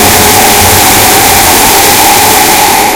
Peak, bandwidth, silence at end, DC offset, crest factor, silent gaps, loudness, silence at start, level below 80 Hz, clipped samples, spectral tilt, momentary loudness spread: 0 dBFS; over 20 kHz; 0 s; under 0.1%; 4 dB; none; -2 LUFS; 0 s; -24 dBFS; 20%; -1.5 dB/octave; 1 LU